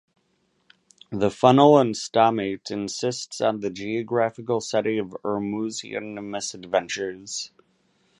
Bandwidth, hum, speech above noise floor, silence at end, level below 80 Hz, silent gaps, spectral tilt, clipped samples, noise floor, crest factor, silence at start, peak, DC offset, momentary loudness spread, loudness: 11.5 kHz; none; 46 dB; 0.75 s; -64 dBFS; none; -5 dB/octave; under 0.1%; -69 dBFS; 22 dB; 1.1 s; -2 dBFS; under 0.1%; 15 LU; -24 LUFS